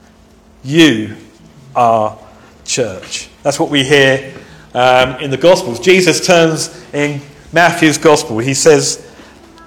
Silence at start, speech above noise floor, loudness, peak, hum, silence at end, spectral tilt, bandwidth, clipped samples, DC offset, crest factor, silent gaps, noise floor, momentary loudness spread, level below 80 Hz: 0.65 s; 33 dB; -12 LUFS; 0 dBFS; none; 0.6 s; -4 dB/octave; 18.5 kHz; 0.4%; under 0.1%; 12 dB; none; -44 dBFS; 14 LU; -46 dBFS